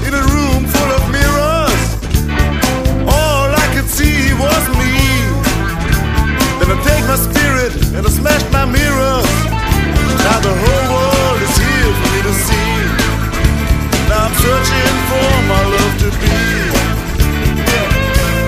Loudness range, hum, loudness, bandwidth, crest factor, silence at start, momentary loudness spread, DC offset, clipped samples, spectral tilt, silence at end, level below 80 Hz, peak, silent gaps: 1 LU; none; -13 LUFS; 15.5 kHz; 12 dB; 0 s; 3 LU; under 0.1%; under 0.1%; -4.5 dB/octave; 0 s; -18 dBFS; 0 dBFS; none